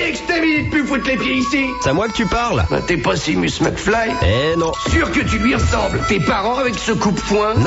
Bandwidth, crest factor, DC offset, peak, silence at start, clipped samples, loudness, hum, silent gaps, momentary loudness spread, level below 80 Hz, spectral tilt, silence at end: 8 kHz; 14 dB; under 0.1%; -4 dBFS; 0 s; under 0.1%; -17 LUFS; none; none; 2 LU; -30 dBFS; -5 dB/octave; 0 s